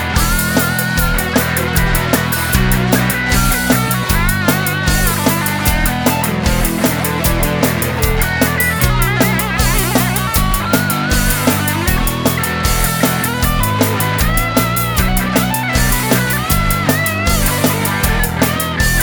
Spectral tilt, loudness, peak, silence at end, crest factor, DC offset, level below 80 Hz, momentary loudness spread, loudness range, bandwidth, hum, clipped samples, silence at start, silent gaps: -4 dB/octave; -14 LUFS; 0 dBFS; 0 s; 14 dB; under 0.1%; -22 dBFS; 2 LU; 1 LU; over 20 kHz; none; under 0.1%; 0 s; none